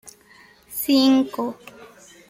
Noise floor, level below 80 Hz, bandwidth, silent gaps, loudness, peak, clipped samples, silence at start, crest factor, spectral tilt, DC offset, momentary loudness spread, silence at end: -52 dBFS; -64 dBFS; 16 kHz; none; -20 LUFS; -8 dBFS; under 0.1%; 0.05 s; 16 dB; -3.5 dB/octave; under 0.1%; 16 LU; 0.45 s